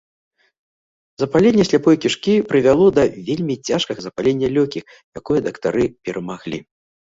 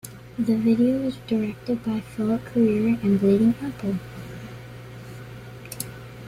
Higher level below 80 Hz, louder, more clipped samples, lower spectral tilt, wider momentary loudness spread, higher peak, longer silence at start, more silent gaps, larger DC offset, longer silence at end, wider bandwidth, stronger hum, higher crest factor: about the same, -50 dBFS vs -52 dBFS; first, -18 LUFS vs -23 LUFS; neither; about the same, -6 dB/octave vs -7 dB/octave; second, 14 LU vs 20 LU; first, -2 dBFS vs -8 dBFS; first, 1.2 s vs 0.05 s; first, 5.04-5.12 s vs none; neither; first, 0.45 s vs 0 s; second, 8 kHz vs 15.5 kHz; neither; about the same, 16 dB vs 16 dB